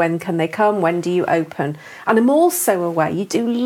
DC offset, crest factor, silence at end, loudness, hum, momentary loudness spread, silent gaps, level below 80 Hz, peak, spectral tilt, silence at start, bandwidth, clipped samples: under 0.1%; 16 dB; 0 s; -18 LUFS; none; 9 LU; none; -68 dBFS; -2 dBFS; -5 dB/octave; 0 s; 17 kHz; under 0.1%